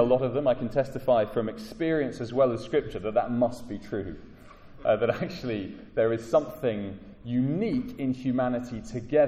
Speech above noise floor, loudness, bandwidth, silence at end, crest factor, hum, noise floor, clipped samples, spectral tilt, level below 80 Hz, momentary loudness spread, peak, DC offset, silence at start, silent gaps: 21 dB; -28 LUFS; 14.5 kHz; 0 s; 18 dB; none; -48 dBFS; under 0.1%; -7.5 dB/octave; -52 dBFS; 10 LU; -10 dBFS; under 0.1%; 0 s; none